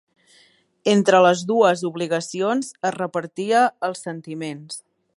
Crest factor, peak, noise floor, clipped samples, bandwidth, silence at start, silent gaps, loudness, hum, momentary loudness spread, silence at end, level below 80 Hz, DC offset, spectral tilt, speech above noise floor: 18 dB; -2 dBFS; -58 dBFS; under 0.1%; 11.5 kHz; 0.85 s; none; -20 LUFS; none; 16 LU; 0.35 s; -74 dBFS; under 0.1%; -4.5 dB/octave; 37 dB